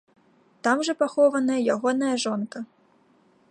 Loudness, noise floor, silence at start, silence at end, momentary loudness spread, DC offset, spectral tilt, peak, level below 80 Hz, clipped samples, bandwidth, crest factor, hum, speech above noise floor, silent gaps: -24 LUFS; -61 dBFS; 0.65 s; 0.85 s; 13 LU; under 0.1%; -4 dB/octave; -8 dBFS; -80 dBFS; under 0.1%; 11 kHz; 18 dB; none; 38 dB; none